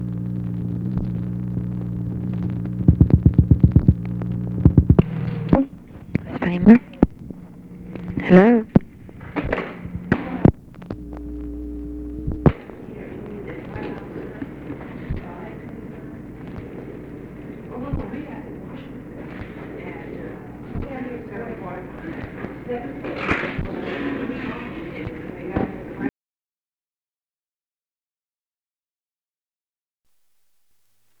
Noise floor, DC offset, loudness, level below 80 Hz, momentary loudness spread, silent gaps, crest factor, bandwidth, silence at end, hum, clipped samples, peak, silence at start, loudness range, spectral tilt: under -90 dBFS; under 0.1%; -22 LUFS; -34 dBFS; 20 LU; none; 22 dB; 5.6 kHz; 5.1 s; none; under 0.1%; 0 dBFS; 0 s; 16 LU; -10 dB/octave